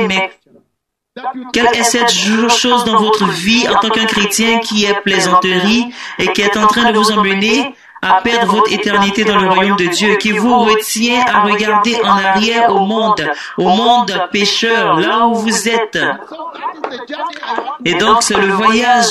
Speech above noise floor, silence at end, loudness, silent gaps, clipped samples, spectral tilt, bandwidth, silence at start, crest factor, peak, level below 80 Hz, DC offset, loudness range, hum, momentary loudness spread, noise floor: 59 dB; 0 s; -12 LUFS; none; under 0.1%; -3 dB/octave; 13.5 kHz; 0 s; 12 dB; 0 dBFS; -48 dBFS; under 0.1%; 3 LU; none; 10 LU; -72 dBFS